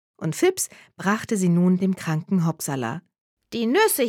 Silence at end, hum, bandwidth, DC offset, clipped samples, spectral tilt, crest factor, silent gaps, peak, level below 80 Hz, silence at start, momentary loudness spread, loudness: 0 s; none; 17 kHz; under 0.1%; under 0.1%; -5.5 dB/octave; 16 dB; 3.21-3.37 s; -6 dBFS; -68 dBFS; 0.2 s; 10 LU; -23 LUFS